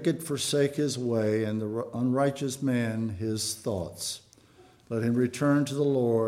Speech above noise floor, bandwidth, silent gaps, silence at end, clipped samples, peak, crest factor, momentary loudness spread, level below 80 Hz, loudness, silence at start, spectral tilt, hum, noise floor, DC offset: 30 dB; 16.5 kHz; none; 0 s; under 0.1%; -12 dBFS; 14 dB; 8 LU; -64 dBFS; -28 LUFS; 0 s; -5.5 dB/octave; none; -57 dBFS; under 0.1%